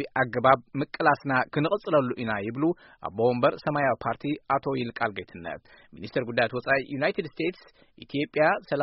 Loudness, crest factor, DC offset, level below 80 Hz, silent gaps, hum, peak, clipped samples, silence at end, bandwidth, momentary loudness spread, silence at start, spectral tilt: -26 LUFS; 24 dB; under 0.1%; -62 dBFS; none; none; -4 dBFS; under 0.1%; 0 s; 5.8 kHz; 11 LU; 0 s; -4.5 dB/octave